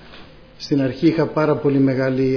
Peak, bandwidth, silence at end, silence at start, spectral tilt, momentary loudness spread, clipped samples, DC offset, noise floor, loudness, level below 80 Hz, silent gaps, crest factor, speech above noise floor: -4 dBFS; 5.4 kHz; 0 s; 0.05 s; -8 dB/octave; 4 LU; under 0.1%; under 0.1%; -42 dBFS; -18 LUFS; -50 dBFS; none; 14 dB; 24 dB